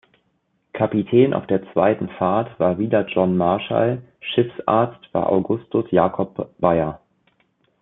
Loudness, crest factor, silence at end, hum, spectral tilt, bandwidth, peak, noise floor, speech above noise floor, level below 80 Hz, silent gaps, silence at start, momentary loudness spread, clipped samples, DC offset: -20 LUFS; 18 dB; 0.85 s; none; -11.5 dB/octave; 4 kHz; -2 dBFS; -68 dBFS; 49 dB; -56 dBFS; none; 0.75 s; 6 LU; under 0.1%; under 0.1%